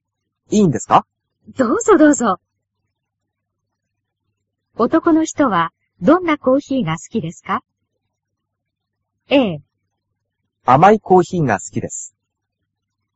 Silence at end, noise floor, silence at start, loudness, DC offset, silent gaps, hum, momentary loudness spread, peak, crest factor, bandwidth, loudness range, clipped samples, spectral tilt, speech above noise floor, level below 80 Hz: 1.1 s; -77 dBFS; 0.5 s; -16 LUFS; under 0.1%; none; none; 14 LU; 0 dBFS; 18 dB; 8 kHz; 6 LU; under 0.1%; -5.5 dB/octave; 63 dB; -54 dBFS